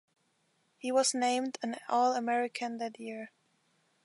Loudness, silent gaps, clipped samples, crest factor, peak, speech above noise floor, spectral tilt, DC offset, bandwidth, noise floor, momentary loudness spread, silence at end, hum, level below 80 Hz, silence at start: -32 LUFS; none; under 0.1%; 18 dB; -16 dBFS; 43 dB; -2 dB/octave; under 0.1%; 11.5 kHz; -74 dBFS; 14 LU; 0.75 s; none; -90 dBFS; 0.85 s